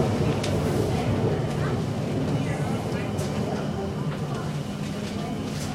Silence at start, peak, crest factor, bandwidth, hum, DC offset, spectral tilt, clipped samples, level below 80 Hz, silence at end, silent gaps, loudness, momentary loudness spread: 0 s; -10 dBFS; 16 dB; 15.5 kHz; none; under 0.1%; -6.5 dB/octave; under 0.1%; -44 dBFS; 0 s; none; -27 LUFS; 6 LU